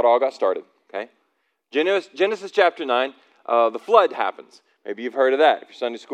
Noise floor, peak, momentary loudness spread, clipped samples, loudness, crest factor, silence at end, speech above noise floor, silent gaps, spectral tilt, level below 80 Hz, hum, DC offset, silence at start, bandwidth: -71 dBFS; -2 dBFS; 16 LU; under 0.1%; -21 LUFS; 20 dB; 0 s; 50 dB; none; -3.5 dB/octave; under -90 dBFS; none; under 0.1%; 0 s; 9.2 kHz